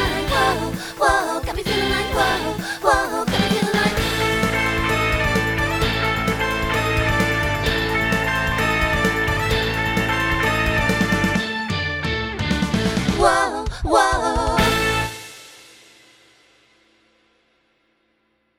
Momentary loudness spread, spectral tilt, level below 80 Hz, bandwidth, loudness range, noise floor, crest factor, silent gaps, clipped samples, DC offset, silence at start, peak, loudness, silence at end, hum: 5 LU; -4.5 dB/octave; -32 dBFS; 20 kHz; 2 LU; -66 dBFS; 20 dB; none; under 0.1%; under 0.1%; 0 s; -2 dBFS; -19 LUFS; 2.95 s; none